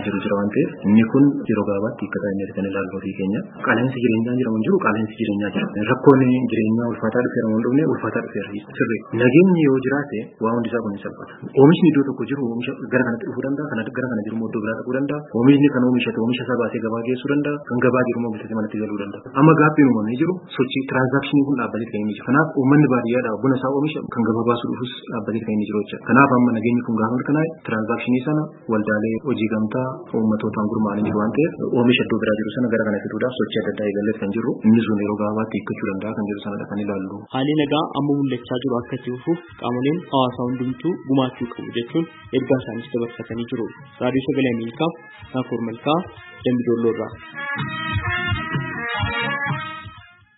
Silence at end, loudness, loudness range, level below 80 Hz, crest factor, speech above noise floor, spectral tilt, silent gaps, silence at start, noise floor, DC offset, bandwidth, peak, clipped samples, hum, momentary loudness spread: 0.35 s; -21 LUFS; 5 LU; -52 dBFS; 20 dB; 25 dB; -11 dB/octave; none; 0 s; -44 dBFS; under 0.1%; 4.1 kHz; 0 dBFS; under 0.1%; none; 11 LU